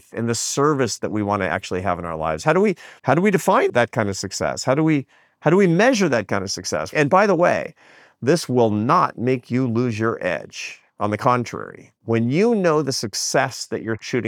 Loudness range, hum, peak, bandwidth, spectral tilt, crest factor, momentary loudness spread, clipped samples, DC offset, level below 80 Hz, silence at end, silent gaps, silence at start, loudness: 3 LU; none; -2 dBFS; 18.5 kHz; -5 dB/octave; 18 dB; 10 LU; under 0.1%; under 0.1%; -60 dBFS; 0 s; none; 0.15 s; -20 LUFS